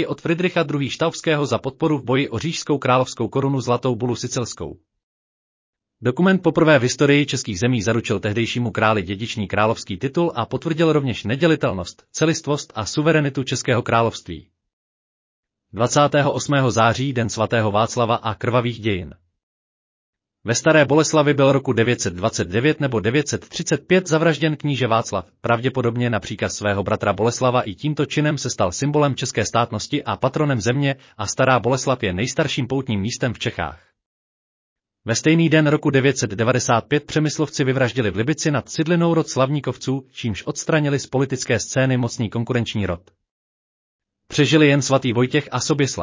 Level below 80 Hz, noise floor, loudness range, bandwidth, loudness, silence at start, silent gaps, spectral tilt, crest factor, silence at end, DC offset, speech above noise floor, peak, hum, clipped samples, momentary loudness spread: -48 dBFS; under -90 dBFS; 4 LU; 7.8 kHz; -20 LUFS; 0 s; 5.03-5.73 s, 14.73-15.43 s, 19.43-20.13 s, 34.06-34.76 s, 43.31-43.99 s; -5 dB/octave; 18 dB; 0 s; under 0.1%; over 71 dB; -2 dBFS; none; under 0.1%; 9 LU